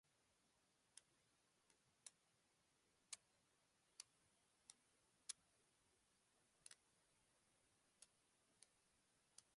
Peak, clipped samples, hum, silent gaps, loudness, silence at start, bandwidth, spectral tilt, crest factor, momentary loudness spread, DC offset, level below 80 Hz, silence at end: -34 dBFS; under 0.1%; none; none; -63 LUFS; 0.05 s; 11 kHz; 0.5 dB/octave; 36 dB; 12 LU; under 0.1%; under -90 dBFS; 0 s